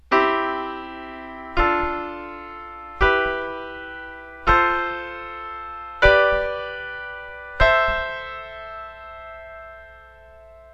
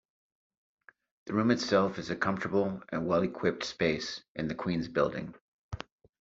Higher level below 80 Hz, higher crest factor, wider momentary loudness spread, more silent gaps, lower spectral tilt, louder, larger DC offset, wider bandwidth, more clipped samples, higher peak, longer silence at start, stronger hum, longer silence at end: first, -36 dBFS vs -60 dBFS; about the same, 22 dB vs 20 dB; first, 20 LU vs 16 LU; second, none vs 4.28-4.35 s, 5.41-5.71 s; first, -6 dB/octave vs -4.5 dB/octave; first, -21 LUFS vs -31 LUFS; neither; about the same, 8.4 kHz vs 7.8 kHz; neither; first, 0 dBFS vs -12 dBFS; second, 0.1 s vs 1.25 s; neither; second, 0 s vs 0.45 s